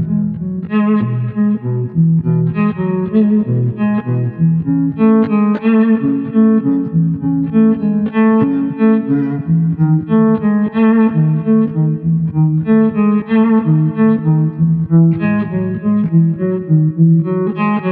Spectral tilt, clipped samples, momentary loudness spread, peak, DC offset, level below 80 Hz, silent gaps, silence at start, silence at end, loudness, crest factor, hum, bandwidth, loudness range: -13 dB/octave; under 0.1%; 5 LU; -2 dBFS; under 0.1%; -48 dBFS; none; 0 s; 0 s; -14 LUFS; 12 dB; none; 3.6 kHz; 2 LU